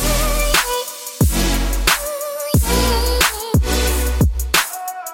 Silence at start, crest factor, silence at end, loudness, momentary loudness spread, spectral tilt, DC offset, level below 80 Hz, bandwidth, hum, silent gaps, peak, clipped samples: 0 s; 16 dB; 0 s; -17 LUFS; 7 LU; -3.5 dB/octave; under 0.1%; -22 dBFS; 17 kHz; none; none; -2 dBFS; under 0.1%